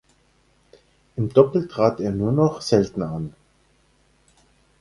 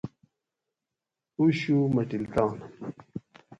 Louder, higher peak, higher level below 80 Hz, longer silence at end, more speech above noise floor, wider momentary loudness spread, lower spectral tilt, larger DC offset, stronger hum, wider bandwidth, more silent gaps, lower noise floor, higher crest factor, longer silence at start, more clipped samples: first, -21 LUFS vs -26 LUFS; first, -2 dBFS vs -12 dBFS; first, -52 dBFS vs -60 dBFS; first, 1.5 s vs 0.05 s; second, 41 dB vs 62 dB; second, 13 LU vs 18 LU; about the same, -7.5 dB/octave vs -8 dB/octave; neither; first, 60 Hz at -50 dBFS vs none; first, 11.5 kHz vs 8 kHz; neither; second, -61 dBFS vs -88 dBFS; about the same, 22 dB vs 18 dB; first, 1.15 s vs 0.05 s; neither